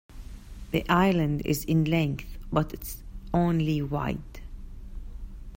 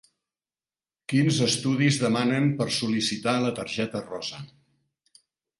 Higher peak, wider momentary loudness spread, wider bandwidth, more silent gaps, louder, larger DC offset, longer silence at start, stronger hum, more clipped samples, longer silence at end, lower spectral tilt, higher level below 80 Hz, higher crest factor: about the same, -8 dBFS vs -8 dBFS; first, 22 LU vs 12 LU; first, 16.5 kHz vs 11.5 kHz; neither; about the same, -27 LUFS vs -25 LUFS; neither; second, 0.1 s vs 1.1 s; neither; neither; second, 0.05 s vs 1.15 s; first, -6.5 dB/octave vs -5 dB/octave; first, -40 dBFS vs -64 dBFS; about the same, 20 dB vs 18 dB